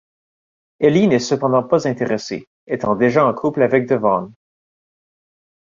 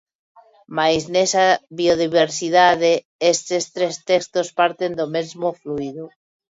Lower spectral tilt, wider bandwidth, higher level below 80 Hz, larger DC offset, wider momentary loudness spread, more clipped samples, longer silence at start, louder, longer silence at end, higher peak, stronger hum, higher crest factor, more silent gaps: first, -6.5 dB/octave vs -3 dB/octave; about the same, 7.6 kHz vs 8 kHz; about the same, -58 dBFS vs -58 dBFS; neither; about the same, 10 LU vs 12 LU; neither; about the same, 0.8 s vs 0.7 s; about the same, -17 LUFS vs -19 LUFS; first, 1.45 s vs 0.5 s; about the same, -2 dBFS vs -2 dBFS; neither; about the same, 16 dB vs 18 dB; first, 2.47-2.67 s vs 3.05-3.19 s